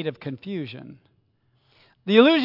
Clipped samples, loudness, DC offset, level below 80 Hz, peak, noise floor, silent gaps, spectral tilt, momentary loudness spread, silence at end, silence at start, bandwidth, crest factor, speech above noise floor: under 0.1%; -22 LUFS; under 0.1%; -76 dBFS; -4 dBFS; -66 dBFS; none; -7.5 dB/octave; 21 LU; 0 s; 0 s; 5.8 kHz; 20 dB; 45 dB